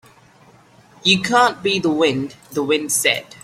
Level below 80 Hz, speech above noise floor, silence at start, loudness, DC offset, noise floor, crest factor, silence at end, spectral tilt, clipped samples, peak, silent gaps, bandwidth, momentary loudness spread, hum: -58 dBFS; 31 dB; 1.05 s; -17 LUFS; under 0.1%; -50 dBFS; 18 dB; 0.2 s; -3 dB/octave; under 0.1%; -2 dBFS; none; 16.5 kHz; 9 LU; none